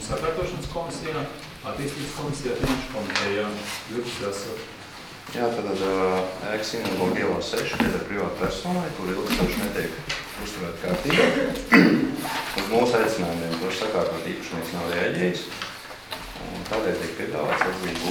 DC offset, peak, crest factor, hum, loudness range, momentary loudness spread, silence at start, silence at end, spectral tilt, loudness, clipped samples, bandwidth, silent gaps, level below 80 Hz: under 0.1%; 0 dBFS; 26 dB; none; 7 LU; 12 LU; 0 s; 0 s; -4.5 dB/octave; -25 LUFS; under 0.1%; 19.5 kHz; none; -46 dBFS